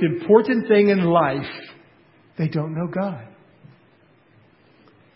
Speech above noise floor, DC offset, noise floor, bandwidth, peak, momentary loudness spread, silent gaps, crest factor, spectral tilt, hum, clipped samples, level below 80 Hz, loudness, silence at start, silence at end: 37 dB; under 0.1%; -56 dBFS; 5.8 kHz; 0 dBFS; 18 LU; none; 22 dB; -12 dB/octave; none; under 0.1%; -62 dBFS; -20 LUFS; 0 s; 1.9 s